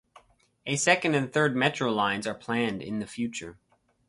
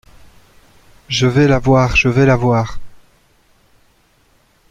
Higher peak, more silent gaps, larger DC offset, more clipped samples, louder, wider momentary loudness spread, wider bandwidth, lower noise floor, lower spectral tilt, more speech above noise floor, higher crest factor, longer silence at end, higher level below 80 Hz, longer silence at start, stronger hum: second, -6 dBFS vs 0 dBFS; neither; neither; neither; second, -27 LUFS vs -13 LUFS; first, 11 LU vs 7 LU; first, 11.5 kHz vs 7.8 kHz; first, -59 dBFS vs -55 dBFS; second, -4 dB/octave vs -6 dB/octave; second, 32 dB vs 43 dB; first, 22 dB vs 16 dB; second, 0.55 s vs 1.75 s; second, -64 dBFS vs -34 dBFS; second, 0.65 s vs 1.1 s; neither